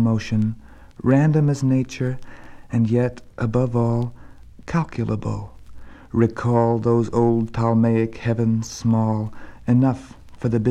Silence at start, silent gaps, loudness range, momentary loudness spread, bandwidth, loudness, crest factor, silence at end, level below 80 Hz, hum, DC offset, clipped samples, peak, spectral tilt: 0 s; none; 4 LU; 11 LU; 8.8 kHz; -21 LUFS; 16 dB; 0 s; -46 dBFS; none; under 0.1%; under 0.1%; -4 dBFS; -8.5 dB/octave